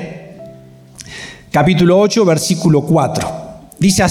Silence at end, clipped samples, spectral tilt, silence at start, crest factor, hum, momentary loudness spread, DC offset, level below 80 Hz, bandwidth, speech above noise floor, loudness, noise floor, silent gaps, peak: 0 s; under 0.1%; -5.5 dB/octave; 0 s; 12 dB; none; 22 LU; under 0.1%; -42 dBFS; 16 kHz; 27 dB; -13 LUFS; -38 dBFS; none; -2 dBFS